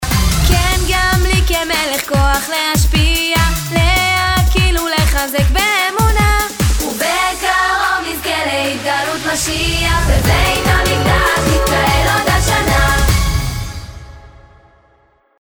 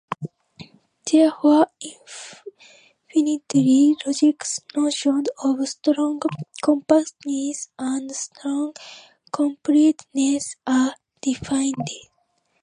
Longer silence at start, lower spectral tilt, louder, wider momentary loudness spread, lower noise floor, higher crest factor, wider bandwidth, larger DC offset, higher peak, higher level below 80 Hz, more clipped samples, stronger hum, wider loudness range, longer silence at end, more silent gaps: about the same, 0 s vs 0.1 s; about the same, -3.5 dB/octave vs -4.5 dB/octave; first, -14 LUFS vs -21 LUFS; second, 4 LU vs 17 LU; second, -54 dBFS vs -68 dBFS; about the same, 14 dB vs 18 dB; first, over 20 kHz vs 11 kHz; neither; about the same, 0 dBFS vs -2 dBFS; first, -18 dBFS vs -64 dBFS; neither; neither; about the same, 2 LU vs 3 LU; first, 1.15 s vs 0.6 s; neither